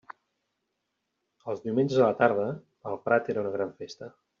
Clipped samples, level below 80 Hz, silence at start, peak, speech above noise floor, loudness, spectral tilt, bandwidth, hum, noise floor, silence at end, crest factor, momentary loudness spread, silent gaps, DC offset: under 0.1%; -74 dBFS; 1.45 s; -8 dBFS; 54 dB; -27 LUFS; -5.5 dB/octave; 7.4 kHz; none; -81 dBFS; 0.3 s; 20 dB; 19 LU; none; under 0.1%